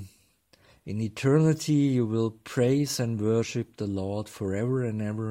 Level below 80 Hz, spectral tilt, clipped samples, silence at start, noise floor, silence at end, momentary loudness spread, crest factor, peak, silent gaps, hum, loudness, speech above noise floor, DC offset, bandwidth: -64 dBFS; -6.5 dB/octave; under 0.1%; 0 s; -63 dBFS; 0 s; 10 LU; 16 dB; -10 dBFS; none; none; -27 LUFS; 37 dB; under 0.1%; 16 kHz